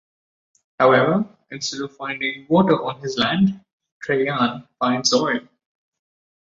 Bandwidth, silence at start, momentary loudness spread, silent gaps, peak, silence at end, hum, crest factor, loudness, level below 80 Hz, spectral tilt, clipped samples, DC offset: 7.8 kHz; 0.8 s; 12 LU; 3.73-3.80 s, 3.92-4.00 s; -2 dBFS; 1.1 s; none; 18 dB; -20 LUFS; -60 dBFS; -4.5 dB/octave; under 0.1%; under 0.1%